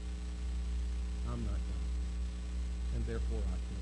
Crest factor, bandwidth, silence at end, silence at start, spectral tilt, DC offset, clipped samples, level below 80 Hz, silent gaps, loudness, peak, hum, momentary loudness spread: 10 dB; 10 kHz; 0 s; 0 s; -6.5 dB/octave; under 0.1%; under 0.1%; -36 dBFS; none; -39 LUFS; -26 dBFS; none; 3 LU